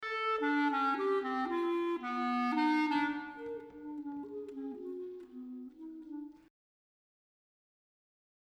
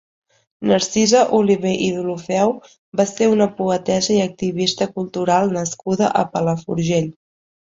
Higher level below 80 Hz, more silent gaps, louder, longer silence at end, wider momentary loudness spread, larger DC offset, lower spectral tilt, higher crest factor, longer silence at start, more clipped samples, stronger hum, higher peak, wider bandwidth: second, -76 dBFS vs -58 dBFS; second, none vs 2.78-2.92 s; second, -34 LUFS vs -18 LUFS; first, 2.2 s vs 0.65 s; first, 17 LU vs 8 LU; neither; about the same, -4.5 dB/octave vs -5 dB/octave; about the same, 16 dB vs 16 dB; second, 0 s vs 0.6 s; neither; neither; second, -22 dBFS vs -2 dBFS; first, 9.4 kHz vs 8 kHz